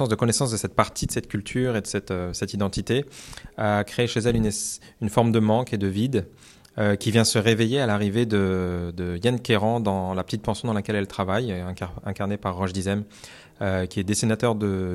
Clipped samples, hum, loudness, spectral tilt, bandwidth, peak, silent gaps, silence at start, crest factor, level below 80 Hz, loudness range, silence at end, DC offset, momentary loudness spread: under 0.1%; none; -24 LUFS; -5 dB/octave; 14.5 kHz; -4 dBFS; none; 0 s; 20 dB; -48 dBFS; 5 LU; 0 s; under 0.1%; 10 LU